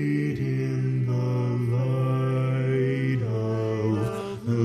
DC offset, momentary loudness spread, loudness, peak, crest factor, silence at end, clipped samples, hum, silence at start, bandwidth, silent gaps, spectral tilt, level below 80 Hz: under 0.1%; 3 LU; -26 LUFS; -12 dBFS; 12 dB; 0 s; under 0.1%; none; 0 s; 9.6 kHz; none; -8.5 dB/octave; -56 dBFS